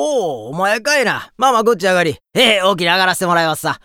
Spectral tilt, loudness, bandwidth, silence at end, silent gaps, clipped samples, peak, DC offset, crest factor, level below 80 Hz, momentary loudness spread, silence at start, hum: -3 dB/octave; -14 LUFS; 18.5 kHz; 0.1 s; none; under 0.1%; 0 dBFS; under 0.1%; 16 dB; -58 dBFS; 7 LU; 0 s; none